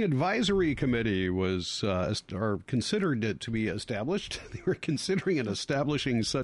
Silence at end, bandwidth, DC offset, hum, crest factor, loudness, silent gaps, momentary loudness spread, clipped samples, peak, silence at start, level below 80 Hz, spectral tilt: 0 s; 11.5 kHz; under 0.1%; none; 12 dB; -30 LUFS; none; 5 LU; under 0.1%; -16 dBFS; 0 s; -50 dBFS; -5.5 dB/octave